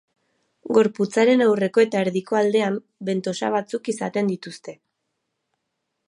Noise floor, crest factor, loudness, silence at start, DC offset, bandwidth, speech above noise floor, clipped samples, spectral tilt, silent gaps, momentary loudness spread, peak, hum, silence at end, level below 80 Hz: -78 dBFS; 18 dB; -21 LUFS; 0.65 s; under 0.1%; 11 kHz; 57 dB; under 0.1%; -5.5 dB/octave; none; 11 LU; -4 dBFS; none; 1.35 s; -76 dBFS